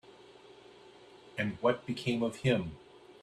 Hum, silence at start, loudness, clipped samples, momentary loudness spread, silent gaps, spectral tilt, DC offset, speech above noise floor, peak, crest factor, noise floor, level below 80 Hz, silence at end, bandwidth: none; 0.2 s; -33 LUFS; under 0.1%; 24 LU; none; -6.5 dB/octave; under 0.1%; 24 dB; -14 dBFS; 22 dB; -56 dBFS; -64 dBFS; 0.05 s; 13 kHz